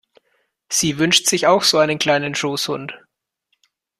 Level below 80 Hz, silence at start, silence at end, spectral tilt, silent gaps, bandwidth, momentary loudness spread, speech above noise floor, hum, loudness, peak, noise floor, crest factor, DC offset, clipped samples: -58 dBFS; 0.7 s; 1.05 s; -2.5 dB/octave; none; 14.5 kHz; 10 LU; 53 dB; none; -17 LUFS; -2 dBFS; -71 dBFS; 18 dB; under 0.1%; under 0.1%